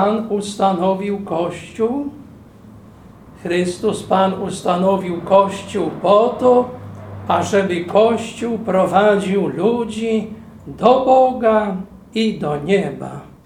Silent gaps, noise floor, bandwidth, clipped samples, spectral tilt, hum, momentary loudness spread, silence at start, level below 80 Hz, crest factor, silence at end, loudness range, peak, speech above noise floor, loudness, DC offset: none; -41 dBFS; 14 kHz; under 0.1%; -6 dB/octave; none; 12 LU; 0 s; -50 dBFS; 18 dB; 0.2 s; 6 LU; 0 dBFS; 25 dB; -17 LUFS; under 0.1%